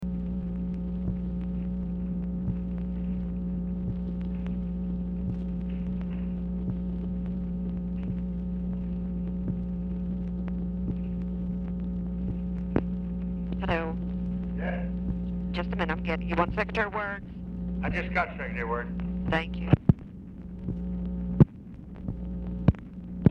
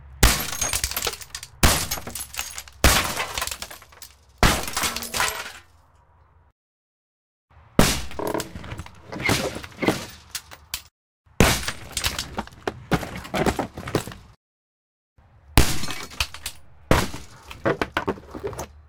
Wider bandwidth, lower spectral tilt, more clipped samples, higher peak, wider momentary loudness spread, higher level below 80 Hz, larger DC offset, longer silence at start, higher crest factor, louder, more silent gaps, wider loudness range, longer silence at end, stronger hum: second, 5.6 kHz vs 19 kHz; first, -9.5 dB/octave vs -3 dB/octave; neither; second, -6 dBFS vs 0 dBFS; second, 6 LU vs 16 LU; about the same, -38 dBFS vs -34 dBFS; neither; about the same, 0 s vs 0 s; about the same, 24 dB vs 26 dB; second, -31 LUFS vs -24 LUFS; second, none vs 6.52-7.48 s, 10.91-11.24 s, 14.37-15.16 s; about the same, 4 LU vs 5 LU; about the same, 0 s vs 0.1 s; neither